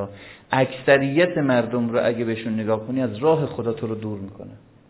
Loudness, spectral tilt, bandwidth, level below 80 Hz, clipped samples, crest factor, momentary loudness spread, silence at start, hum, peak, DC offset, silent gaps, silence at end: -22 LUFS; -10.5 dB/octave; 4 kHz; -56 dBFS; under 0.1%; 20 dB; 16 LU; 0 s; none; -2 dBFS; under 0.1%; none; 0.3 s